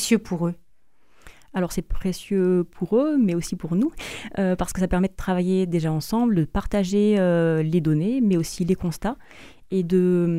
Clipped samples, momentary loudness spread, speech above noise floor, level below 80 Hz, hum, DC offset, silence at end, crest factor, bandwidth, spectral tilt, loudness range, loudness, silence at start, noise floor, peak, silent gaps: under 0.1%; 9 LU; 43 dB; -40 dBFS; none; 0.4%; 0 s; 16 dB; 15.5 kHz; -6.5 dB/octave; 3 LU; -23 LUFS; 0 s; -65 dBFS; -8 dBFS; none